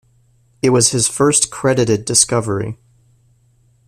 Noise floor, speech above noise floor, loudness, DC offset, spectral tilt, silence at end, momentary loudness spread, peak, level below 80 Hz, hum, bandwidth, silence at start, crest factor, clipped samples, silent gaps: -55 dBFS; 40 dB; -14 LUFS; under 0.1%; -3.5 dB/octave; 1.15 s; 10 LU; 0 dBFS; -50 dBFS; none; 15.5 kHz; 0.65 s; 18 dB; under 0.1%; none